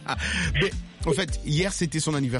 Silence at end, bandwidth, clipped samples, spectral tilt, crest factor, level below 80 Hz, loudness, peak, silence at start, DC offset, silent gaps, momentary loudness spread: 0 s; 11.5 kHz; under 0.1%; -4.5 dB/octave; 16 dB; -36 dBFS; -26 LUFS; -10 dBFS; 0 s; under 0.1%; none; 3 LU